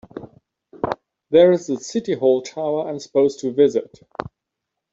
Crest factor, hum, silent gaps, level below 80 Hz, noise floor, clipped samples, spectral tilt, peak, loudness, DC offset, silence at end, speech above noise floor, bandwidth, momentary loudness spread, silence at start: 18 dB; none; none; -58 dBFS; -81 dBFS; under 0.1%; -6 dB/octave; -2 dBFS; -19 LUFS; under 0.1%; 1.1 s; 63 dB; 7.8 kHz; 19 LU; 0.15 s